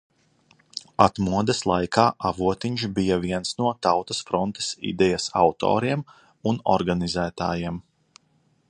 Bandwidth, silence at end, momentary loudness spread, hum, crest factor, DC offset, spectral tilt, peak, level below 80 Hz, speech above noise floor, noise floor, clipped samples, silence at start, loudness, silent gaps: 10.5 kHz; 0.9 s; 9 LU; none; 22 dB; under 0.1%; -5 dB/octave; -2 dBFS; -48 dBFS; 42 dB; -65 dBFS; under 0.1%; 0.75 s; -24 LUFS; none